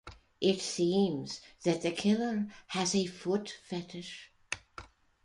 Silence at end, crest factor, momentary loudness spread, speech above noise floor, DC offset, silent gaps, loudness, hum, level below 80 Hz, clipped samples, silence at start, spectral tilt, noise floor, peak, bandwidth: 0.4 s; 20 dB; 14 LU; 21 dB; under 0.1%; none; -33 LUFS; none; -64 dBFS; under 0.1%; 0.05 s; -4.5 dB/octave; -53 dBFS; -14 dBFS; 11.5 kHz